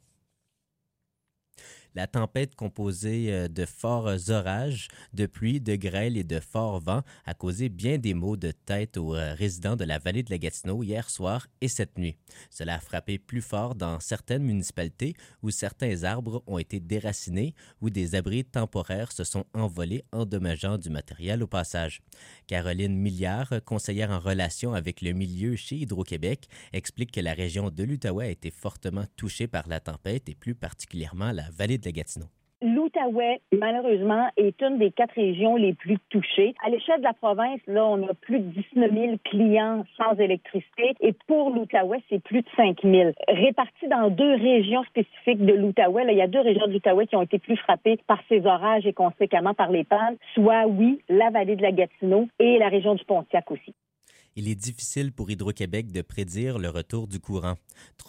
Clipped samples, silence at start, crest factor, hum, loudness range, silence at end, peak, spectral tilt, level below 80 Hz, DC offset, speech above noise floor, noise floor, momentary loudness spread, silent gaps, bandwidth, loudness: under 0.1%; 1.95 s; 18 dB; none; 11 LU; 0.05 s; -6 dBFS; -6 dB/octave; -50 dBFS; under 0.1%; 56 dB; -81 dBFS; 13 LU; none; 16 kHz; -25 LUFS